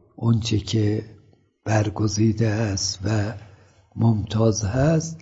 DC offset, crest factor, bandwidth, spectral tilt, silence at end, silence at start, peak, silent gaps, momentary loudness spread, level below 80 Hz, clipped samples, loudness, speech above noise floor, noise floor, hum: under 0.1%; 16 dB; 8 kHz; -6 dB/octave; 0 s; 0.2 s; -6 dBFS; none; 8 LU; -48 dBFS; under 0.1%; -22 LUFS; 35 dB; -56 dBFS; none